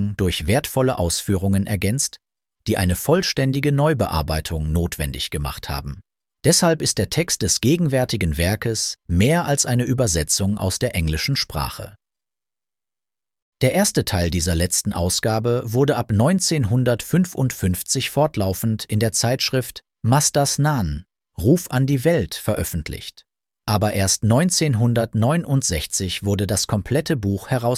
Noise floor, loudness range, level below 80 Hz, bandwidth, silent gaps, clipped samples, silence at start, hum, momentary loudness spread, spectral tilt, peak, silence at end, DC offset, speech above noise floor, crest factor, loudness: under -90 dBFS; 3 LU; -38 dBFS; 16.5 kHz; 13.42-13.52 s; under 0.1%; 0 s; none; 8 LU; -4.5 dB/octave; -4 dBFS; 0 s; under 0.1%; over 70 dB; 18 dB; -20 LUFS